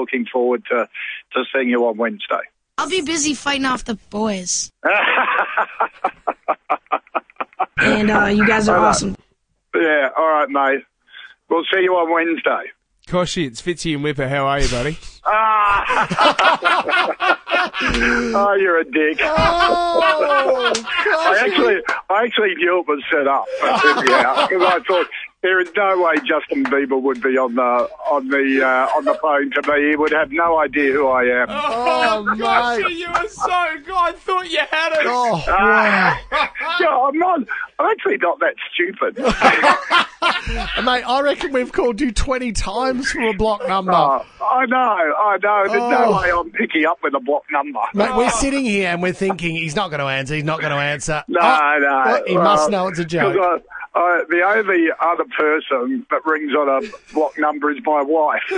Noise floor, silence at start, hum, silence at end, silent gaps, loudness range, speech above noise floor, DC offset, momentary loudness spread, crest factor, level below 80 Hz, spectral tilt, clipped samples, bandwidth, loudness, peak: -64 dBFS; 0 s; none; 0 s; none; 4 LU; 47 dB; under 0.1%; 8 LU; 18 dB; -38 dBFS; -4 dB/octave; under 0.1%; 10.5 kHz; -17 LUFS; 0 dBFS